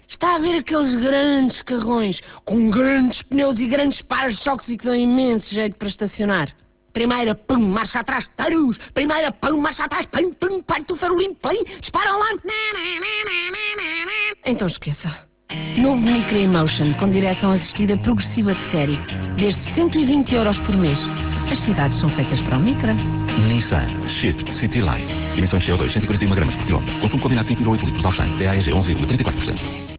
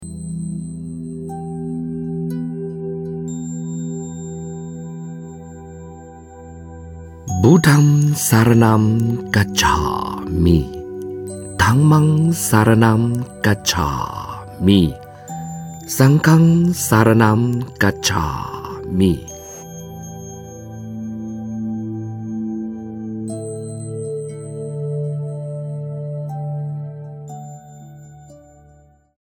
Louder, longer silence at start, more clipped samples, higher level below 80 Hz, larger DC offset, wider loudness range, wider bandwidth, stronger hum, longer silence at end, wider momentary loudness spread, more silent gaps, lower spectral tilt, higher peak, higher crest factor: about the same, -20 LUFS vs -18 LUFS; about the same, 0.1 s vs 0 s; neither; about the same, -34 dBFS vs -38 dBFS; neither; second, 2 LU vs 14 LU; second, 4 kHz vs 17.5 kHz; neither; second, 0 s vs 0.85 s; second, 7 LU vs 21 LU; neither; first, -10.5 dB/octave vs -5.5 dB/octave; second, -4 dBFS vs 0 dBFS; about the same, 14 dB vs 18 dB